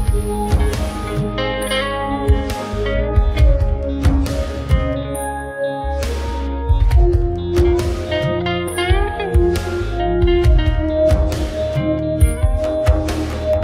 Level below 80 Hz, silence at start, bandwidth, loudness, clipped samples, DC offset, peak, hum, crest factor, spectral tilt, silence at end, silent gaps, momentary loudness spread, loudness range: -20 dBFS; 0 s; 15 kHz; -18 LUFS; under 0.1%; under 0.1%; -2 dBFS; none; 14 dB; -6.5 dB/octave; 0 s; none; 7 LU; 2 LU